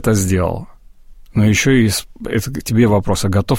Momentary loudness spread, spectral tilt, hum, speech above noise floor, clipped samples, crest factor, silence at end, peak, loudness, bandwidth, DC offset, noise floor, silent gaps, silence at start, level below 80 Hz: 9 LU; -5.5 dB/octave; none; 25 dB; under 0.1%; 14 dB; 0 s; -2 dBFS; -16 LUFS; 16.5 kHz; under 0.1%; -39 dBFS; none; 0 s; -34 dBFS